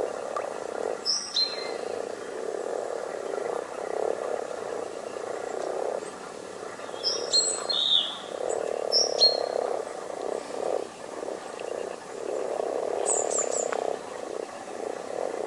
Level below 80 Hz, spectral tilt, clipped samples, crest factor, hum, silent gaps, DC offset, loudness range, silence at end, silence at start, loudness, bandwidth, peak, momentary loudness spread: -74 dBFS; -0.5 dB/octave; under 0.1%; 22 dB; none; none; under 0.1%; 9 LU; 0 s; 0 s; -28 LUFS; 11.5 kHz; -8 dBFS; 13 LU